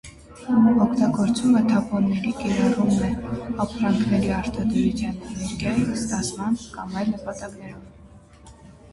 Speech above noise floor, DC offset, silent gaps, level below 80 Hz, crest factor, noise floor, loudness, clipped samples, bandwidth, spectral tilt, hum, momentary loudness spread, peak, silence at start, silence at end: 25 dB; under 0.1%; none; -44 dBFS; 16 dB; -47 dBFS; -23 LUFS; under 0.1%; 11.5 kHz; -6 dB/octave; none; 12 LU; -6 dBFS; 0.05 s; 0.2 s